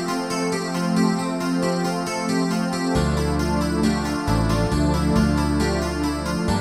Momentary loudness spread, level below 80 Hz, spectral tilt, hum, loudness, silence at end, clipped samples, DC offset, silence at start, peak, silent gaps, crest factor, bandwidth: 4 LU; -32 dBFS; -6 dB/octave; none; -22 LUFS; 0 s; under 0.1%; under 0.1%; 0 s; -6 dBFS; none; 14 dB; 14.5 kHz